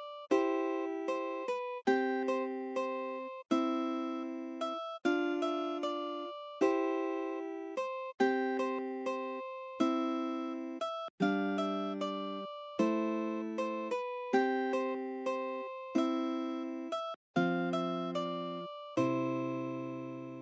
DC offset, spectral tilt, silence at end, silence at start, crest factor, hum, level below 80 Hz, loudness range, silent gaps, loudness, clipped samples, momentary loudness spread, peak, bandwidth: under 0.1%; -6 dB/octave; 0 s; 0 s; 18 dB; none; -88 dBFS; 1 LU; 11.10-11.18 s, 17.16-17.34 s; -35 LUFS; under 0.1%; 8 LU; -16 dBFS; 8 kHz